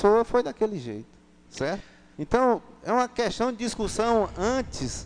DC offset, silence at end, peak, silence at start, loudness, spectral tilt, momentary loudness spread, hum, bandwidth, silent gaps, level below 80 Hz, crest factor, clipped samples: under 0.1%; 0 s; -6 dBFS; 0 s; -26 LUFS; -5 dB/octave; 13 LU; none; 10 kHz; none; -46 dBFS; 20 dB; under 0.1%